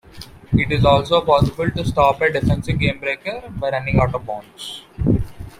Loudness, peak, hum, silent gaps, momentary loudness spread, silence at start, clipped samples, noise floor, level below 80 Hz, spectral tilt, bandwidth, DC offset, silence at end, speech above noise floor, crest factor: -19 LUFS; -2 dBFS; none; none; 15 LU; 0.15 s; under 0.1%; -39 dBFS; -34 dBFS; -7 dB/octave; 15.5 kHz; under 0.1%; 0.1 s; 21 dB; 18 dB